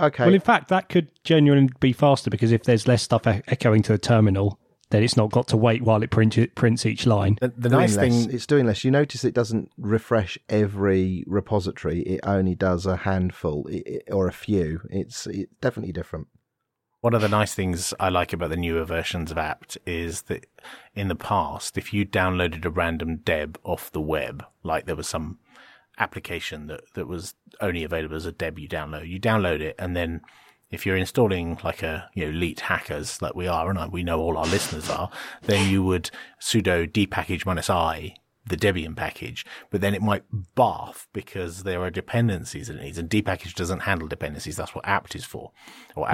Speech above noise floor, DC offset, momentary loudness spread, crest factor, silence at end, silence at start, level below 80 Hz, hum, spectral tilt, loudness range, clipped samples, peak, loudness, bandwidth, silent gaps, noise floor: 56 dB; under 0.1%; 13 LU; 20 dB; 0 s; 0 s; -46 dBFS; none; -6 dB/octave; 8 LU; under 0.1%; -4 dBFS; -24 LUFS; 16.5 kHz; none; -80 dBFS